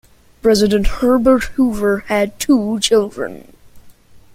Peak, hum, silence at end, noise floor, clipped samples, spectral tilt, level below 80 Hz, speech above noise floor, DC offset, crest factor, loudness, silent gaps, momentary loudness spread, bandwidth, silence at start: 0 dBFS; none; 0.45 s; -43 dBFS; under 0.1%; -4.5 dB/octave; -32 dBFS; 28 dB; under 0.1%; 16 dB; -15 LUFS; none; 6 LU; 16.5 kHz; 0.45 s